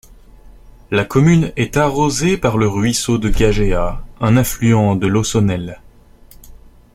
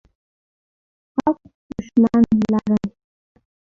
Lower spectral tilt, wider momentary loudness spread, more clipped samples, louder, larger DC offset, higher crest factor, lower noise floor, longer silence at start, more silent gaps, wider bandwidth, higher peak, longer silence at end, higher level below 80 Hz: second, -5.5 dB/octave vs -8.5 dB/octave; second, 7 LU vs 17 LU; neither; first, -16 LUFS vs -19 LUFS; neither; about the same, 14 dB vs 16 dB; second, -43 dBFS vs under -90 dBFS; second, 0.45 s vs 1.15 s; second, none vs 1.55-1.69 s; first, 16.5 kHz vs 7 kHz; about the same, -2 dBFS vs -4 dBFS; second, 0.4 s vs 0.8 s; first, -28 dBFS vs -50 dBFS